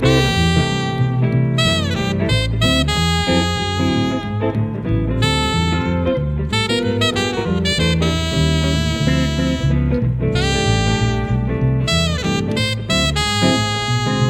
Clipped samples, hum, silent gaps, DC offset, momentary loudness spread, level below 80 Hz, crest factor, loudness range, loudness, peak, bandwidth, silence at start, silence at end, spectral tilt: under 0.1%; none; none; under 0.1%; 4 LU; -28 dBFS; 16 dB; 1 LU; -17 LUFS; -2 dBFS; 16 kHz; 0 s; 0 s; -5 dB/octave